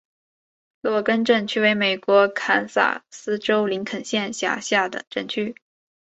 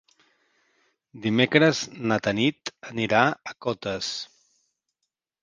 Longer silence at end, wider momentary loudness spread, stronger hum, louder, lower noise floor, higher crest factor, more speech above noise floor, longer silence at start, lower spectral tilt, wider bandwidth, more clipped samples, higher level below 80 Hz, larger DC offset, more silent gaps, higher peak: second, 0.5 s vs 1.15 s; second, 10 LU vs 14 LU; neither; about the same, -22 LUFS vs -24 LUFS; first, under -90 dBFS vs -83 dBFS; about the same, 20 dB vs 24 dB; first, over 68 dB vs 58 dB; second, 0.85 s vs 1.15 s; second, -3.5 dB/octave vs -5 dB/octave; second, 8.2 kHz vs 9.8 kHz; neither; about the same, -68 dBFS vs -64 dBFS; neither; first, 5.07-5.11 s vs none; about the same, -4 dBFS vs -2 dBFS